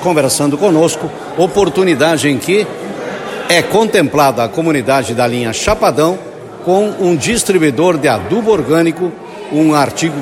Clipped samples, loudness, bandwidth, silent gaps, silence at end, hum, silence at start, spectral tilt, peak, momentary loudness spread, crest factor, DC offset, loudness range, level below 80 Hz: under 0.1%; -13 LUFS; 16.5 kHz; none; 0 s; none; 0 s; -4.5 dB/octave; 0 dBFS; 10 LU; 12 dB; under 0.1%; 1 LU; -42 dBFS